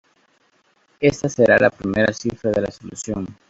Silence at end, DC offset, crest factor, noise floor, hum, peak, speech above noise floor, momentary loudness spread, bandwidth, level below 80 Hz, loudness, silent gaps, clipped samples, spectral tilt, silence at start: 0.2 s; under 0.1%; 20 dB; -62 dBFS; none; 0 dBFS; 42 dB; 14 LU; 8 kHz; -50 dBFS; -19 LUFS; none; under 0.1%; -5.5 dB/octave; 1 s